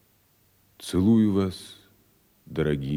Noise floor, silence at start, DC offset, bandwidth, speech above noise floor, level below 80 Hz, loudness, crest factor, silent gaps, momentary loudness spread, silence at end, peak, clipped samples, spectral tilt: -64 dBFS; 0.8 s; under 0.1%; 15.5 kHz; 41 dB; -54 dBFS; -24 LUFS; 16 dB; none; 21 LU; 0 s; -10 dBFS; under 0.1%; -7.5 dB/octave